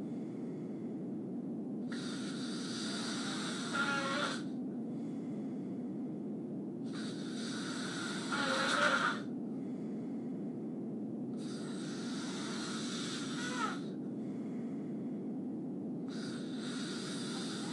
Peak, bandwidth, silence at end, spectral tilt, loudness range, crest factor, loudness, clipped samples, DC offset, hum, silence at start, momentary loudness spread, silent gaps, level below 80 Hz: -16 dBFS; 11.5 kHz; 0 s; -4 dB/octave; 5 LU; 22 dB; -39 LUFS; under 0.1%; under 0.1%; none; 0 s; 8 LU; none; -84 dBFS